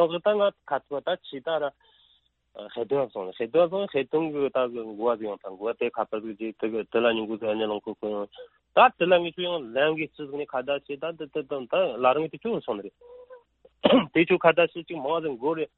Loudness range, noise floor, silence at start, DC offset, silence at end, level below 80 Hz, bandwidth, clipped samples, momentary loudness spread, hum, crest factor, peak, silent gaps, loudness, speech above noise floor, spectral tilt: 4 LU; -66 dBFS; 0 s; under 0.1%; 0.1 s; -68 dBFS; 4.2 kHz; under 0.1%; 13 LU; none; 22 dB; -4 dBFS; none; -26 LUFS; 40 dB; -9.5 dB/octave